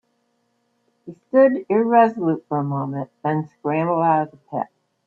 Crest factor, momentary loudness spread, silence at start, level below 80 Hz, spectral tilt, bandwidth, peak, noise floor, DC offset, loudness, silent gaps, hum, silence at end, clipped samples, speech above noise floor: 18 dB; 13 LU; 1.05 s; -70 dBFS; -10.5 dB/octave; 4.5 kHz; -4 dBFS; -68 dBFS; under 0.1%; -20 LUFS; none; none; 0.4 s; under 0.1%; 49 dB